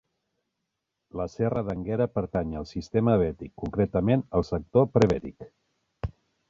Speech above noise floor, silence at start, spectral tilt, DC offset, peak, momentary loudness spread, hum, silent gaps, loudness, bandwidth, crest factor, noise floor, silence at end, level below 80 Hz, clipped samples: 56 dB; 1.15 s; -8.5 dB/octave; under 0.1%; -6 dBFS; 15 LU; none; none; -27 LUFS; 7.8 kHz; 22 dB; -82 dBFS; 0.4 s; -46 dBFS; under 0.1%